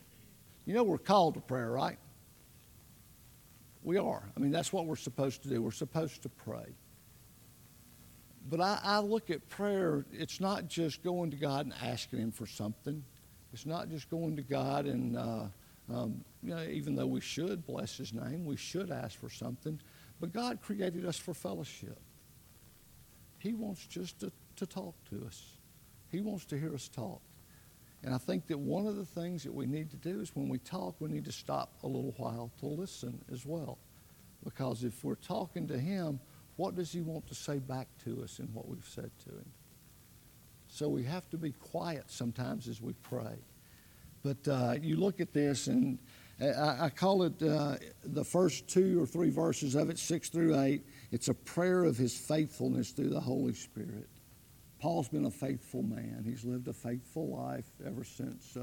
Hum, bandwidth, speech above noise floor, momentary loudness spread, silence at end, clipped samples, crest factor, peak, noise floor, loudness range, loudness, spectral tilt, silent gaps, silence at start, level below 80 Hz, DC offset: none; 18 kHz; 24 dB; 15 LU; 0 s; under 0.1%; 22 dB; -14 dBFS; -60 dBFS; 11 LU; -37 LUFS; -6 dB/octave; none; 0 s; -68 dBFS; under 0.1%